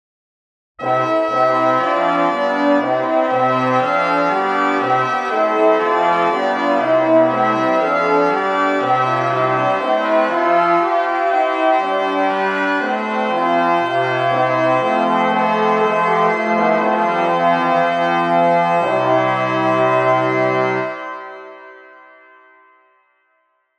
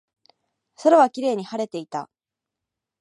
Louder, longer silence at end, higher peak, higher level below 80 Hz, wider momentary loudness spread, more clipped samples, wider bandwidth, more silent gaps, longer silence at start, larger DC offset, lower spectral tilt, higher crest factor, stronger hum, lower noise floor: first, -16 LUFS vs -21 LUFS; first, 1.95 s vs 0.95 s; about the same, -2 dBFS vs -4 dBFS; first, -68 dBFS vs -82 dBFS; second, 3 LU vs 16 LU; neither; second, 9.2 kHz vs 11 kHz; neither; about the same, 0.8 s vs 0.8 s; neither; about the same, -6 dB/octave vs -5.5 dB/octave; second, 14 dB vs 20 dB; neither; second, -64 dBFS vs -86 dBFS